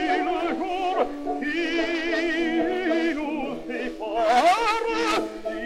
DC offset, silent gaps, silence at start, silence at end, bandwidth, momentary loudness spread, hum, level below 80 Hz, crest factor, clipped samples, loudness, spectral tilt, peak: under 0.1%; none; 0 s; 0 s; 14.5 kHz; 10 LU; none; -50 dBFS; 18 dB; under 0.1%; -24 LUFS; -3 dB/octave; -6 dBFS